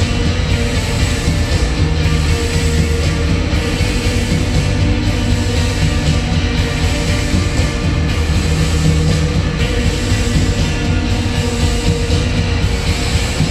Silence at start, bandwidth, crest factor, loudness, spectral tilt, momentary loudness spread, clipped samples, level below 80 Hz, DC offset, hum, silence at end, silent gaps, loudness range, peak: 0 s; 15 kHz; 14 dB; -16 LUFS; -5 dB/octave; 2 LU; under 0.1%; -18 dBFS; under 0.1%; none; 0 s; none; 1 LU; 0 dBFS